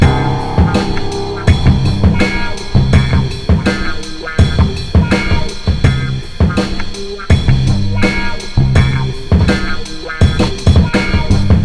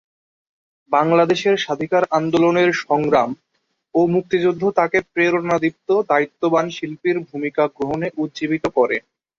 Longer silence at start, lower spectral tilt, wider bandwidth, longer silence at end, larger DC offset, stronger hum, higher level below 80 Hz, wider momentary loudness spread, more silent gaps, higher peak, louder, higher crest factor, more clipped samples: second, 0 s vs 0.9 s; about the same, -6.5 dB/octave vs -6 dB/octave; first, 11 kHz vs 7.6 kHz; second, 0 s vs 0.4 s; neither; neither; first, -18 dBFS vs -58 dBFS; about the same, 8 LU vs 8 LU; neither; about the same, 0 dBFS vs -2 dBFS; first, -14 LUFS vs -19 LUFS; about the same, 12 dB vs 16 dB; neither